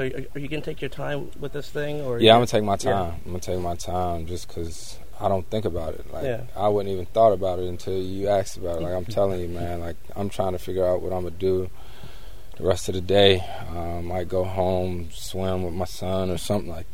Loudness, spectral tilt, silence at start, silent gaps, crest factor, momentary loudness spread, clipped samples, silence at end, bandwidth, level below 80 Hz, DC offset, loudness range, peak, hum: -25 LUFS; -5.5 dB/octave; 0 s; none; 24 dB; 15 LU; under 0.1%; 0 s; 16 kHz; -44 dBFS; 3%; 5 LU; 0 dBFS; none